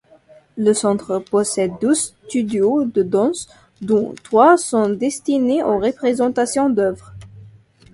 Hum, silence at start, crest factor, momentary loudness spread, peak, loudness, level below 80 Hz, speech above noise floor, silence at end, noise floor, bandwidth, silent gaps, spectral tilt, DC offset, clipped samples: none; 0.55 s; 18 dB; 8 LU; 0 dBFS; -18 LUFS; -54 dBFS; 32 dB; 0.45 s; -49 dBFS; 11.5 kHz; none; -5 dB/octave; under 0.1%; under 0.1%